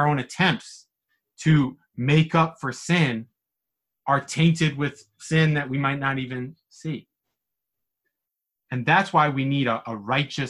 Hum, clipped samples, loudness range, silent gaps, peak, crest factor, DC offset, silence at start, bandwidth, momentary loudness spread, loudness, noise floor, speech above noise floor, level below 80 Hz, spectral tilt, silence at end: none; under 0.1%; 5 LU; none; -4 dBFS; 20 dB; under 0.1%; 0 s; 11.5 kHz; 14 LU; -23 LUFS; -84 dBFS; 62 dB; -58 dBFS; -6 dB/octave; 0 s